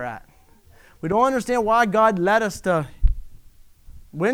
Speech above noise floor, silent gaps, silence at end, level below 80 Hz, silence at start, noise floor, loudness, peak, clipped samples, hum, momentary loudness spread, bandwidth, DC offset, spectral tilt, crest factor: 32 dB; none; 0 s; -30 dBFS; 0 s; -52 dBFS; -20 LUFS; -4 dBFS; under 0.1%; none; 16 LU; 15.5 kHz; under 0.1%; -6 dB/octave; 18 dB